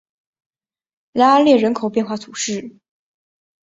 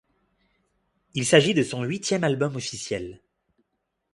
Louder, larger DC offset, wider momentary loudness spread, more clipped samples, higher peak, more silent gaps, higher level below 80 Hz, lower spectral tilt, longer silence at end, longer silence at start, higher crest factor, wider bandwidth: first, -17 LUFS vs -24 LUFS; neither; about the same, 13 LU vs 14 LU; neither; about the same, -2 dBFS vs -4 dBFS; neither; about the same, -64 dBFS vs -60 dBFS; about the same, -4 dB/octave vs -4.5 dB/octave; about the same, 0.95 s vs 1 s; about the same, 1.15 s vs 1.15 s; second, 18 dB vs 24 dB; second, 8 kHz vs 11.5 kHz